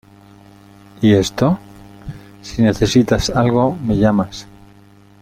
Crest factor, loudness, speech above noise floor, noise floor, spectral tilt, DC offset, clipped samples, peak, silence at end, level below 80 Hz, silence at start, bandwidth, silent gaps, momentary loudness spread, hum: 16 dB; -16 LUFS; 31 dB; -46 dBFS; -6 dB/octave; under 0.1%; under 0.1%; -2 dBFS; 0.8 s; -36 dBFS; 1 s; 15.5 kHz; none; 21 LU; none